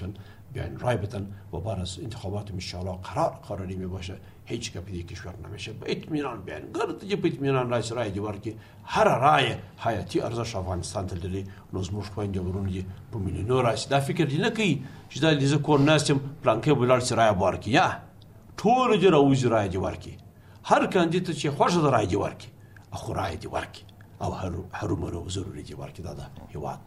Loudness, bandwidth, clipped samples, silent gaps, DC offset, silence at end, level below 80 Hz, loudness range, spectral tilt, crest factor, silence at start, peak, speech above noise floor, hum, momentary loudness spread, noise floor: -26 LUFS; 14.5 kHz; under 0.1%; none; under 0.1%; 0 s; -52 dBFS; 10 LU; -5.5 dB/octave; 20 dB; 0 s; -6 dBFS; 23 dB; none; 17 LU; -49 dBFS